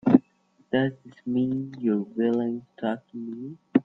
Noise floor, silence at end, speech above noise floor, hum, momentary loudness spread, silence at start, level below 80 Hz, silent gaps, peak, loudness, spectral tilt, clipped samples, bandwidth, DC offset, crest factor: -64 dBFS; 0.05 s; 37 dB; none; 13 LU; 0.05 s; -66 dBFS; none; -2 dBFS; -27 LUFS; -9.5 dB/octave; under 0.1%; 4.3 kHz; under 0.1%; 24 dB